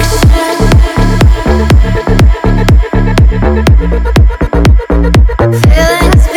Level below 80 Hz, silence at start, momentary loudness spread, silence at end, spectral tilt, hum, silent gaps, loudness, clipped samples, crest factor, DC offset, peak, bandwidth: -8 dBFS; 0 s; 3 LU; 0 s; -6.5 dB/octave; none; none; -8 LUFS; 10%; 6 dB; under 0.1%; 0 dBFS; 15.5 kHz